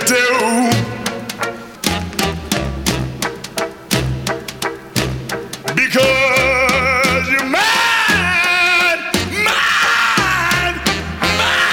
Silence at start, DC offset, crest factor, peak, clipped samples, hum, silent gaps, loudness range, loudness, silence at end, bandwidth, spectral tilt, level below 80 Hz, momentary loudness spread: 0 s; under 0.1%; 14 dB; -2 dBFS; under 0.1%; none; none; 8 LU; -15 LUFS; 0 s; 19.5 kHz; -3 dB/octave; -36 dBFS; 11 LU